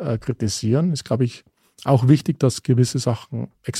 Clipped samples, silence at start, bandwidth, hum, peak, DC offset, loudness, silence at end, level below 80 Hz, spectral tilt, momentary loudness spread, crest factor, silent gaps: under 0.1%; 0 s; 14 kHz; none; -2 dBFS; under 0.1%; -21 LUFS; 0 s; -54 dBFS; -6.5 dB/octave; 11 LU; 18 dB; none